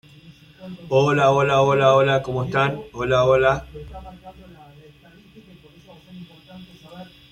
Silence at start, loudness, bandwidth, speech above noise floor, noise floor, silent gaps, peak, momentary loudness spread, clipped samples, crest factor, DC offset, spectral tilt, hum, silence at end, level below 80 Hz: 0.3 s; -19 LUFS; 9.8 kHz; 29 dB; -49 dBFS; none; -4 dBFS; 26 LU; under 0.1%; 18 dB; under 0.1%; -6 dB/octave; none; 0.3 s; -48 dBFS